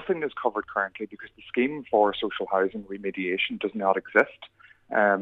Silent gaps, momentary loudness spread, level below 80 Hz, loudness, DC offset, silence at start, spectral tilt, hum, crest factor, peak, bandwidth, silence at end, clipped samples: none; 10 LU; -64 dBFS; -26 LUFS; under 0.1%; 0 s; -6.5 dB/octave; none; 22 dB; -6 dBFS; 6.8 kHz; 0 s; under 0.1%